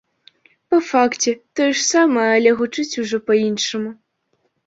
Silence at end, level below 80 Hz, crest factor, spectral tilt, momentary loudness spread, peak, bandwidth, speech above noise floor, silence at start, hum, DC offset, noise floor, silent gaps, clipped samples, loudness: 0.75 s; -66 dBFS; 16 dB; -3 dB/octave; 8 LU; -2 dBFS; 8 kHz; 50 dB; 0.7 s; none; under 0.1%; -68 dBFS; none; under 0.1%; -18 LUFS